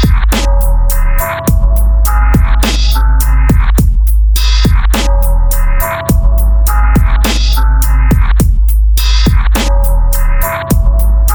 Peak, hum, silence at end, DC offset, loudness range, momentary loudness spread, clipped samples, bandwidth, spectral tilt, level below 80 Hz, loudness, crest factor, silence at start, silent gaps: 0 dBFS; none; 0 s; under 0.1%; 1 LU; 3 LU; under 0.1%; over 20 kHz; -5 dB/octave; -8 dBFS; -11 LUFS; 8 dB; 0 s; none